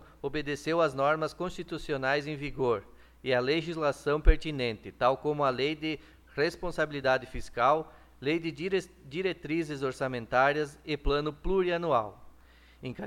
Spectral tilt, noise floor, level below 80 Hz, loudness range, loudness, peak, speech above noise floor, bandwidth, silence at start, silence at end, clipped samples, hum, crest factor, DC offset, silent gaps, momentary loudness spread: -6 dB/octave; -57 dBFS; -38 dBFS; 1 LU; -30 LUFS; -8 dBFS; 27 dB; 13 kHz; 0 s; 0 s; under 0.1%; none; 22 dB; under 0.1%; none; 10 LU